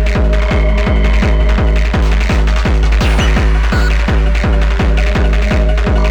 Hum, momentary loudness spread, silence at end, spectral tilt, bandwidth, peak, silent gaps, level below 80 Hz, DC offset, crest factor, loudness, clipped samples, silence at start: none; 1 LU; 0 s; -6.5 dB/octave; 8.2 kHz; -2 dBFS; none; -12 dBFS; under 0.1%; 10 dB; -13 LUFS; under 0.1%; 0 s